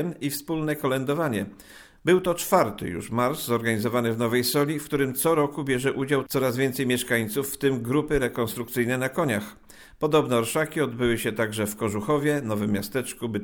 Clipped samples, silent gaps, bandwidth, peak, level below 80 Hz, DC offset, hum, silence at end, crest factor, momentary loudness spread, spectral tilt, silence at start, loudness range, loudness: under 0.1%; none; over 20 kHz; -6 dBFS; -52 dBFS; under 0.1%; none; 0 s; 18 dB; 6 LU; -5 dB/octave; 0 s; 2 LU; -25 LUFS